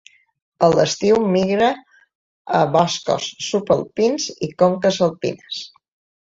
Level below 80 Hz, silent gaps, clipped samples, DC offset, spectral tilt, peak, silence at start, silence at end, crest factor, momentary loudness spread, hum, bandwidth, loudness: -56 dBFS; 2.15-2.45 s; under 0.1%; under 0.1%; -5 dB/octave; -2 dBFS; 0.6 s; 0.55 s; 18 dB; 11 LU; none; 7.8 kHz; -19 LUFS